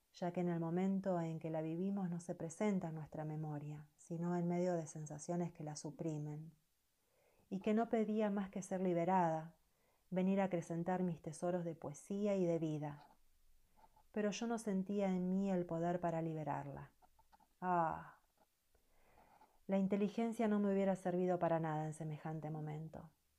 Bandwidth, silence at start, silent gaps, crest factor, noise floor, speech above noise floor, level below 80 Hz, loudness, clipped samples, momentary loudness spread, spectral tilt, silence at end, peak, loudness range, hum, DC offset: 11.5 kHz; 0.15 s; none; 16 dB; -82 dBFS; 42 dB; -76 dBFS; -41 LUFS; under 0.1%; 12 LU; -7.5 dB/octave; 0.3 s; -26 dBFS; 5 LU; none; under 0.1%